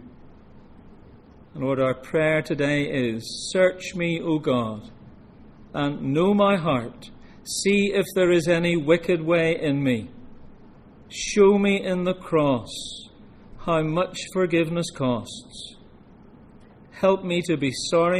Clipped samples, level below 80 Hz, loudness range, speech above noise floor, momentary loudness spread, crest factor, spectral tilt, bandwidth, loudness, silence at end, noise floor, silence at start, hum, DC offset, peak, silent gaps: under 0.1%; -52 dBFS; 5 LU; 26 dB; 15 LU; 18 dB; -5.5 dB/octave; 14.5 kHz; -23 LUFS; 0 s; -49 dBFS; 0 s; none; under 0.1%; -6 dBFS; none